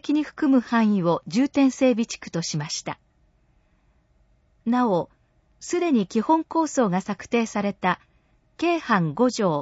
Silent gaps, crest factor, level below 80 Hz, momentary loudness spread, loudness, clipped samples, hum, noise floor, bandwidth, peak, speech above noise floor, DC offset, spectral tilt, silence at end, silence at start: none; 16 dB; -62 dBFS; 9 LU; -23 LUFS; under 0.1%; none; -63 dBFS; 8 kHz; -6 dBFS; 40 dB; under 0.1%; -5.5 dB/octave; 0 s; 0.05 s